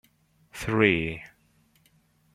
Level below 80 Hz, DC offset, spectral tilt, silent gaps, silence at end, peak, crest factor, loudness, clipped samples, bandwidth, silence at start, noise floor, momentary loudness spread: -54 dBFS; under 0.1%; -6 dB/octave; none; 1.1 s; -4 dBFS; 26 dB; -25 LUFS; under 0.1%; 15.5 kHz; 0.55 s; -64 dBFS; 20 LU